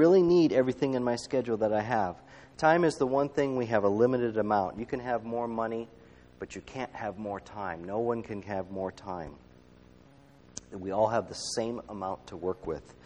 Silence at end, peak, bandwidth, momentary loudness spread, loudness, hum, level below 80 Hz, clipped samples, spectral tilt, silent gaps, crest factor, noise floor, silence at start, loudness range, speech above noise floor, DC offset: 0.15 s; -10 dBFS; 11 kHz; 15 LU; -30 LUFS; none; -60 dBFS; under 0.1%; -6 dB/octave; none; 20 dB; -57 dBFS; 0 s; 9 LU; 28 dB; under 0.1%